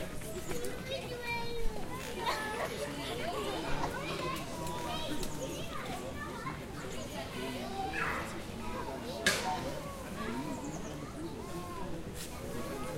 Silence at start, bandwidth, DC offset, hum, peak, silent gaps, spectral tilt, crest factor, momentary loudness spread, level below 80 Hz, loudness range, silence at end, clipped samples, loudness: 0 s; 16 kHz; under 0.1%; none; -14 dBFS; none; -4 dB/octave; 22 dB; 7 LU; -48 dBFS; 3 LU; 0 s; under 0.1%; -38 LUFS